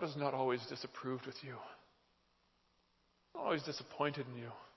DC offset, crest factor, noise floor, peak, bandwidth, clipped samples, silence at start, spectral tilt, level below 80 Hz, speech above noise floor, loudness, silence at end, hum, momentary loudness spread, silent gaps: under 0.1%; 22 dB; -76 dBFS; -20 dBFS; 6.2 kHz; under 0.1%; 0 s; -6 dB/octave; -84 dBFS; 35 dB; -41 LUFS; 0.05 s; none; 13 LU; none